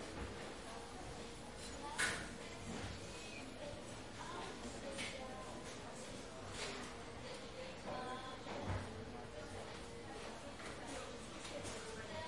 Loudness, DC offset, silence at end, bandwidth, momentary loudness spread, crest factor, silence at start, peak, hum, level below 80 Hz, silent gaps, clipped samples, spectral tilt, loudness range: -48 LUFS; under 0.1%; 0 s; 11.5 kHz; 5 LU; 22 dB; 0 s; -26 dBFS; none; -62 dBFS; none; under 0.1%; -3.5 dB/octave; 3 LU